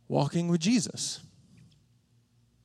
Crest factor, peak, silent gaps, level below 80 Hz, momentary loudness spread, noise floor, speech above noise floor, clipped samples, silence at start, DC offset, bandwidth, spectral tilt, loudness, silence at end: 18 dB; -12 dBFS; none; -72 dBFS; 9 LU; -66 dBFS; 38 dB; under 0.1%; 0.1 s; under 0.1%; 13 kHz; -5 dB/octave; -29 LUFS; 1.45 s